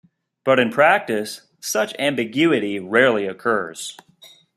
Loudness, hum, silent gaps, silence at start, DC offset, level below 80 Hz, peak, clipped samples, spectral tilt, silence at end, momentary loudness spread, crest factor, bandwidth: -19 LUFS; none; none; 0.45 s; under 0.1%; -68 dBFS; -2 dBFS; under 0.1%; -4 dB/octave; 0.3 s; 14 LU; 18 dB; 15 kHz